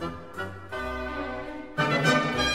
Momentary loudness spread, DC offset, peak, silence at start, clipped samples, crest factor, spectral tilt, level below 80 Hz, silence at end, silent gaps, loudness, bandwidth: 14 LU; 0.4%; -10 dBFS; 0 s; under 0.1%; 20 dB; -4.5 dB/octave; -46 dBFS; 0 s; none; -28 LUFS; 15 kHz